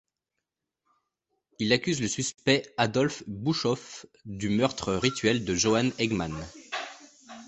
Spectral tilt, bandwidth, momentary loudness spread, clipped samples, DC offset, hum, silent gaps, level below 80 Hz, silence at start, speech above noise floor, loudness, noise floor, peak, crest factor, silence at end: -4 dB/octave; 8.4 kHz; 13 LU; under 0.1%; under 0.1%; none; none; -56 dBFS; 1.6 s; 59 dB; -27 LUFS; -86 dBFS; -6 dBFS; 22 dB; 0 s